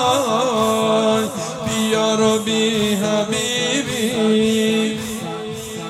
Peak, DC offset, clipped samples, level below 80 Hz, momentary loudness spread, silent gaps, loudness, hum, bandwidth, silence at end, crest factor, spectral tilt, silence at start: -4 dBFS; under 0.1%; under 0.1%; -52 dBFS; 9 LU; none; -18 LUFS; none; 15.5 kHz; 0 s; 14 dB; -4 dB/octave; 0 s